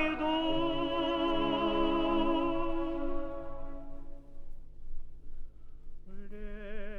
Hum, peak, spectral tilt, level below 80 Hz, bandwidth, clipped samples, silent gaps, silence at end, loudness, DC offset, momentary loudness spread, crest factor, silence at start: 50 Hz at -60 dBFS; -18 dBFS; -7 dB/octave; -40 dBFS; 4.7 kHz; under 0.1%; none; 0 s; -32 LUFS; under 0.1%; 23 LU; 16 dB; 0 s